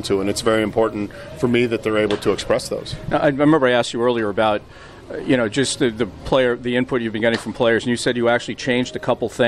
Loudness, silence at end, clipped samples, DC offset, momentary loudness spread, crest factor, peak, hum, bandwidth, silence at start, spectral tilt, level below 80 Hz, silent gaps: -19 LUFS; 0 s; under 0.1%; under 0.1%; 7 LU; 16 dB; -4 dBFS; none; 13.5 kHz; 0 s; -5 dB/octave; -44 dBFS; none